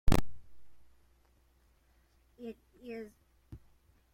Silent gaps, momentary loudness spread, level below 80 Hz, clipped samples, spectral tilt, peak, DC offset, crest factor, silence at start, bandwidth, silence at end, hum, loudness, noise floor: none; 23 LU; -42 dBFS; under 0.1%; -6 dB/octave; -12 dBFS; under 0.1%; 22 dB; 0.05 s; 16.5 kHz; 0.6 s; none; -41 LUFS; -68 dBFS